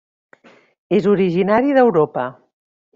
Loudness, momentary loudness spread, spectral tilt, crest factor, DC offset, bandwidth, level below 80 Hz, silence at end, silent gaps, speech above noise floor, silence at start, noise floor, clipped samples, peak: -16 LUFS; 9 LU; -6 dB/octave; 16 dB; under 0.1%; 7.2 kHz; -58 dBFS; 0.65 s; none; 35 dB; 0.9 s; -50 dBFS; under 0.1%; -2 dBFS